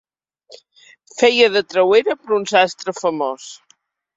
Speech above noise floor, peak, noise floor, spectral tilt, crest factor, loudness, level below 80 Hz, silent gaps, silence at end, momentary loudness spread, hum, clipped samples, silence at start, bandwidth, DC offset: 42 dB; 0 dBFS; -59 dBFS; -3 dB/octave; 18 dB; -16 LUFS; -66 dBFS; none; 0.6 s; 14 LU; none; under 0.1%; 1.15 s; 7.8 kHz; under 0.1%